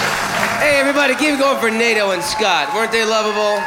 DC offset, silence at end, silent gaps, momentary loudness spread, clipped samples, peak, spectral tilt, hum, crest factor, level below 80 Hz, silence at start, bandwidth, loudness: under 0.1%; 0 s; none; 4 LU; under 0.1%; -2 dBFS; -2.5 dB/octave; none; 14 dB; -50 dBFS; 0 s; 16.5 kHz; -15 LUFS